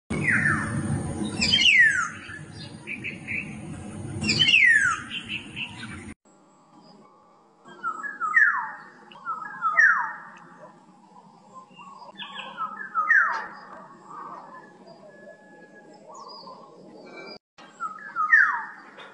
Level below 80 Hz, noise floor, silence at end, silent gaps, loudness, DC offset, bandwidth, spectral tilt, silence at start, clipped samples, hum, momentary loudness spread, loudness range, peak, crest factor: -58 dBFS; -57 dBFS; 0 s; 6.16-6.20 s, 17.40-17.57 s; -22 LUFS; under 0.1%; 10.5 kHz; -2.5 dB/octave; 0.1 s; under 0.1%; none; 25 LU; 20 LU; -6 dBFS; 20 dB